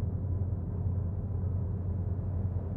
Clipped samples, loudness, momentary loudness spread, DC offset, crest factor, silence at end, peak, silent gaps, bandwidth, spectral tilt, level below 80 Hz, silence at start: under 0.1%; -34 LUFS; 1 LU; under 0.1%; 10 dB; 0 s; -22 dBFS; none; 1.9 kHz; -13 dB/octave; -42 dBFS; 0 s